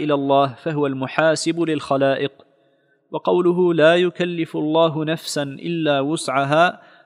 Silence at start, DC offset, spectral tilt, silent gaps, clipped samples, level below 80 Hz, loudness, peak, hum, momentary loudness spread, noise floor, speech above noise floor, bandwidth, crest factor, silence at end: 0 s; under 0.1%; -5.5 dB/octave; none; under 0.1%; -70 dBFS; -19 LUFS; 0 dBFS; none; 9 LU; -61 dBFS; 42 dB; 15 kHz; 18 dB; 0.3 s